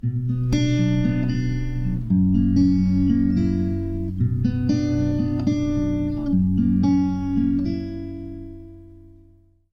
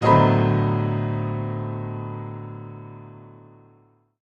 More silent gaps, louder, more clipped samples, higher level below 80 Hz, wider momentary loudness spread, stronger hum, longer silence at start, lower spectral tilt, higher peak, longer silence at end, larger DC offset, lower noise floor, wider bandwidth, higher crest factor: neither; about the same, -21 LUFS vs -23 LUFS; neither; first, -34 dBFS vs -52 dBFS; second, 9 LU vs 23 LU; neither; about the same, 0.05 s vs 0 s; about the same, -8.5 dB/octave vs -9 dB/octave; second, -8 dBFS vs -2 dBFS; second, 0.65 s vs 0.9 s; neither; second, -54 dBFS vs -58 dBFS; about the same, 6.6 kHz vs 6.4 kHz; second, 12 dB vs 20 dB